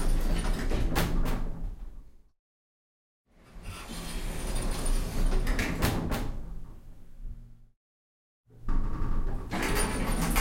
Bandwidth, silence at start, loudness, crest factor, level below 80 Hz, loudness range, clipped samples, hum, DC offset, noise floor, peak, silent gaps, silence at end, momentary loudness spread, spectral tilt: 16.5 kHz; 0 s; -33 LUFS; 16 dB; -32 dBFS; 8 LU; under 0.1%; none; under 0.1%; under -90 dBFS; -12 dBFS; 2.39-3.24 s, 7.76-8.44 s; 0 s; 19 LU; -4.5 dB/octave